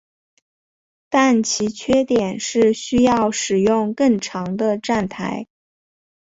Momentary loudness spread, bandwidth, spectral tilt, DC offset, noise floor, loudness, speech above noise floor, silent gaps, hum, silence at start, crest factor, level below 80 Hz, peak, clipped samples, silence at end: 8 LU; 8 kHz; -4.5 dB/octave; under 0.1%; under -90 dBFS; -19 LUFS; over 72 dB; none; none; 1.1 s; 16 dB; -52 dBFS; -4 dBFS; under 0.1%; 0.95 s